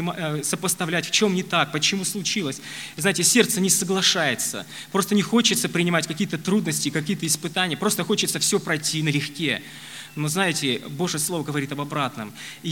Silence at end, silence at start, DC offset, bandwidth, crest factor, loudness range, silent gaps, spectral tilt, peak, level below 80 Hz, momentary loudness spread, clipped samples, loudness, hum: 0 s; 0 s; 0.1%; 17.5 kHz; 22 dB; 4 LU; none; -3 dB/octave; -2 dBFS; -66 dBFS; 10 LU; under 0.1%; -22 LUFS; none